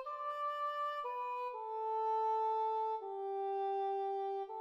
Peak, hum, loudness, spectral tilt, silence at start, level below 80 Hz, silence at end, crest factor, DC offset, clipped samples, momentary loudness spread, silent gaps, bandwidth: -28 dBFS; none; -38 LUFS; -3 dB/octave; 0 s; under -90 dBFS; 0 s; 10 dB; under 0.1%; under 0.1%; 6 LU; none; 8 kHz